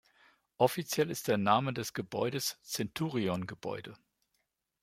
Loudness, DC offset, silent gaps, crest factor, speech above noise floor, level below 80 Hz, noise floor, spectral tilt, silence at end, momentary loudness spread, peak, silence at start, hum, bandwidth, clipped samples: -33 LUFS; under 0.1%; none; 22 dB; 49 dB; -72 dBFS; -81 dBFS; -4.5 dB/octave; 0.85 s; 11 LU; -12 dBFS; 0.6 s; none; 16.5 kHz; under 0.1%